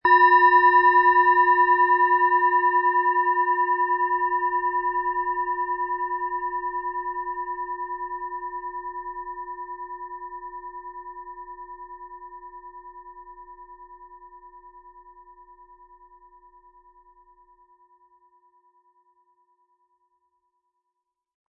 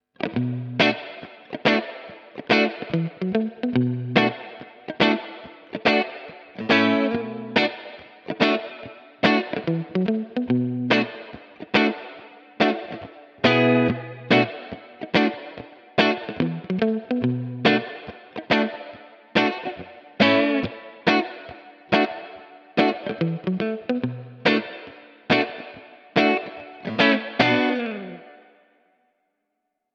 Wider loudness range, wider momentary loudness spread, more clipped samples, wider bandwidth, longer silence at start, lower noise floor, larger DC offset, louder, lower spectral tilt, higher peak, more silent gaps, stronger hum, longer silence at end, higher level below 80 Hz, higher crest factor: first, 25 LU vs 2 LU; first, 25 LU vs 20 LU; neither; second, 5.4 kHz vs 7.6 kHz; second, 0.05 s vs 0.2 s; first, -82 dBFS vs -78 dBFS; neither; about the same, -21 LUFS vs -22 LUFS; about the same, -6.5 dB/octave vs -6.5 dB/octave; about the same, -6 dBFS vs -4 dBFS; neither; neither; first, 6.5 s vs 1.6 s; about the same, -60 dBFS vs -62 dBFS; about the same, 18 dB vs 20 dB